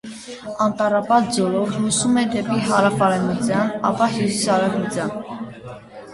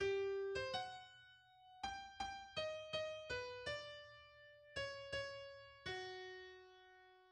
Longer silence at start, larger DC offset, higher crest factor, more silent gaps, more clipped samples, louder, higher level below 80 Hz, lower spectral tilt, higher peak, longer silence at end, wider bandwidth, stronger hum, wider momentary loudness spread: about the same, 0.05 s vs 0 s; neither; about the same, 18 dB vs 16 dB; neither; neither; first, -19 LUFS vs -47 LUFS; first, -54 dBFS vs -70 dBFS; about the same, -4.5 dB/octave vs -3.5 dB/octave; first, -2 dBFS vs -32 dBFS; about the same, 0 s vs 0 s; about the same, 11.5 kHz vs 10.5 kHz; neither; second, 16 LU vs 20 LU